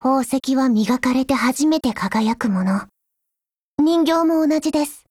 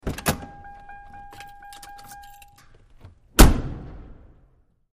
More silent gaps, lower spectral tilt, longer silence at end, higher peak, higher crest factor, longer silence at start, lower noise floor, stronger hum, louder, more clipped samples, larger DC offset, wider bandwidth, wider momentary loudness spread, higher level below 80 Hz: first, 3.57-3.78 s vs none; about the same, -5 dB/octave vs -4.5 dB/octave; second, 0.1 s vs 0.9 s; second, -6 dBFS vs 0 dBFS; second, 14 dB vs 24 dB; about the same, 0 s vs 0.05 s; first, -84 dBFS vs -59 dBFS; neither; about the same, -19 LUFS vs -21 LUFS; neither; neither; about the same, 16 kHz vs 15.5 kHz; second, 5 LU vs 27 LU; second, -54 dBFS vs -26 dBFS